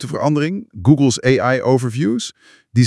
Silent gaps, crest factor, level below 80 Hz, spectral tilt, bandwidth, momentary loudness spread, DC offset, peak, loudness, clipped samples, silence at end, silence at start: none; 16 dB; -54 dBFS; -6 dB/octave; 12 kHz; 9 LU; under 0.1%; 0 dBFS; -17 LUFS; under 0.1%; 0 s; 0 s